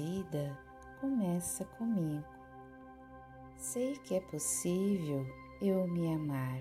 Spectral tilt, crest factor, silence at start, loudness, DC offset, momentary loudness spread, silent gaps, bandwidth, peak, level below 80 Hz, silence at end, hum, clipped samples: -6 dB/octave; 14 dB; 0 s; -36 LUFS; under 0.1%; 20 LU; none; 16 kHz; -22 dBFS; -64 dBFS; 0 s; none; under 0.1%